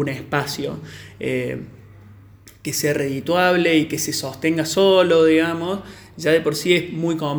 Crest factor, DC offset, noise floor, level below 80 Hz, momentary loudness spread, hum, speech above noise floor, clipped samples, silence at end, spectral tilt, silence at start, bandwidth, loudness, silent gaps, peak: 16 dB; under 0.1%; -46 dBFS; -54 dBFS; 15 LU; none; 26 dB; under 0.1%; 0 s; -4.5 dB/octave; 0 s; over 20 kHz; -19 LUFS; none; -4 dBFS